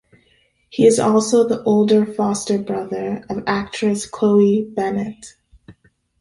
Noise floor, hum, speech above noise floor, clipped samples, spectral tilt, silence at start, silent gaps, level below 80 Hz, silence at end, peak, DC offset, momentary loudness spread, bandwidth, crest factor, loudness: -60 dBFS; none; 42 dB; under 0.1%; -5.5 dB/octave; 0.75 s; none; -54 dBFS; 0.5 s; -2 dBFS; under 0.1%; 11 LU; 11.5 kHz; 16 dB; -18 LUFS